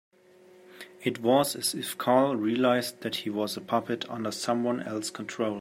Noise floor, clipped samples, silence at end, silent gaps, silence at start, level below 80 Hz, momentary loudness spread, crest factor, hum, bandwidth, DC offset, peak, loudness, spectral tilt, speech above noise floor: -56 dBFS; under 0.1%; 0 s; none; 0.7 s; -76 dBFS; 10 LU; 20 dB; none; 16 kHz; under 0.1%; -10 dBFS; -28 LUFS; -4 dB/octave; 28 dB